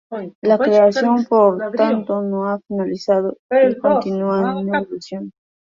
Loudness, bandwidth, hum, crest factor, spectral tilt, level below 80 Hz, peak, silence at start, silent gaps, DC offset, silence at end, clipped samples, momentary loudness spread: -17 LUFS; 7.4 kHz; none; 16 dB; -7 dB/octave; -62 dBFS; -2 dBFS; 0.1 s; 0.35-0.42 s, 3.39-3.49 s; under 0.1%; 0.35 s; under 0.1%; 14 LU